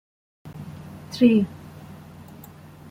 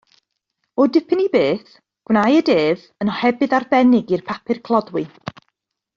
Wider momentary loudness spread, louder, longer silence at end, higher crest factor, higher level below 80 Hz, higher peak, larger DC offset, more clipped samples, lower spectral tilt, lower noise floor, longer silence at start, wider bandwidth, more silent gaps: first, 26 LU vs 12 LU; about the same, -20 LUFS vs -18 LUFS; first, 1.35 s vs 0.9 s; first, 22 dB vs 16 dB; about the same, -60 dBFS vs -60 dBFS; about the same, -6 dBFS vs -4 dBFS; neither; neither; about the same, -7 dB/octave vs -7 dB/octave; second, -44 dBFS vs -74 dBFS; second, 0.45 s vs 0.8 s; first, 16 kHz vs 7.2 kHz; neither